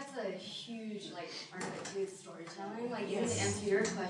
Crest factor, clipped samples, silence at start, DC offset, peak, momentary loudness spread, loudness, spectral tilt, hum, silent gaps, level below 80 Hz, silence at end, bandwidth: 18 dB; under 0.1%; 0 s; under 0.1%; -20 dBFS; 11 LU; -39 LUFS; -4 dB/octave; none; none; -76 dBFS; 0 s; 11.5 kHz